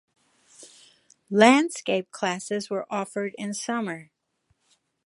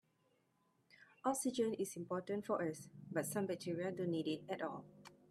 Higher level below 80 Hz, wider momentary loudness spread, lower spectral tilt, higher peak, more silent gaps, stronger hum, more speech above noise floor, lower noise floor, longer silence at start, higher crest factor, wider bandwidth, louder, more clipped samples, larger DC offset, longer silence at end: first, -78 dBFS vs -84 dBFS; first, 14 LU vs 8 LU; about the same, -4 dB/octave vs -5 dB/octave; first, -2 dBFS vs -24 dBFS; neither; neither; first, 48 dB vs 38 dB; second, -72 dBFS vs -79 dBFS; second, 0.6 s vs 1 s; first, 26 dB vs 20 dB; second, 11.5 kHz vs 15 kHz; first, -24 LUFS vs -41 LUFS; neither; neither; first, 1.05 s vs 0.15 s